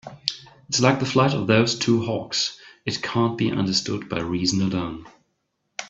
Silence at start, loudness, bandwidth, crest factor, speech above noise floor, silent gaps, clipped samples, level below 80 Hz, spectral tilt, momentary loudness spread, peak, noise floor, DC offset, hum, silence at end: 0.05 s; -23 LUFS; 8.2 kHz; 22 dB; 52 dB; none; under 0.1%; -56 dBFS; -4.5 dB/octave; 10 LU; -2 dBFS; -74 dBFS; under 0.1%; none; 0 s